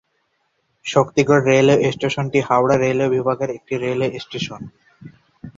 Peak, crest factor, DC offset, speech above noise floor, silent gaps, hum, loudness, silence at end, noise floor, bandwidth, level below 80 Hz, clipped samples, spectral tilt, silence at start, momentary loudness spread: -2 dBFS; 18 dB; under 0.1%; 50 dB; none; none; -18 LUFS; 0.1 s; -68 dBFS; 7.8 kHz; -56 dBFS; under 0.1%; -6 dB/octave; 0.85 s; 13 LU